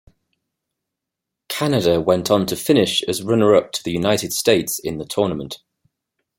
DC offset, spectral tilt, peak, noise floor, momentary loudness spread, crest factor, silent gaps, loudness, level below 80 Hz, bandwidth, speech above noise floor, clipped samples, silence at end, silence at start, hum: under 0.1%; -4.5 dB/octave; -2 dBFS; -83 dBFS; 9 LU; 18 dB; none; -19 LUFS; -54 dBFS; 16.5 kHz; 65 dB; under 0.1%; 0.85 s; 1.5 s; none